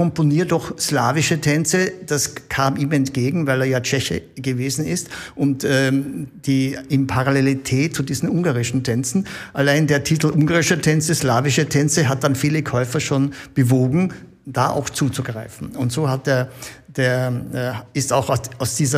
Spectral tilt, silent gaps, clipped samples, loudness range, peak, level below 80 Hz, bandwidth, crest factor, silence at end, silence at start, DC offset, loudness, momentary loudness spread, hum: -5 dB/octave; none; under 0.1%; 4 LU; -4 dBFS; -50 dBFS; 15.5 kHz; 16 dB; 0 s; 0 s; under 0.1%; -19 LUFS; 8 LU; none